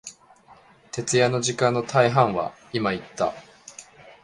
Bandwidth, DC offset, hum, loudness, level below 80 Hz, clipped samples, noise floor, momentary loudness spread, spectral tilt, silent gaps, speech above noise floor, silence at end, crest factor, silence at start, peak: 11.5 kHz; under 0.1%; none; -23 LUFS; -60 dBFS; under 0.1%; -53 dBFS; 23 LU; -4.5 dB/octave; none; 30 dB; 0.1 s; 22 dB; 0.05 s; -4 dBFS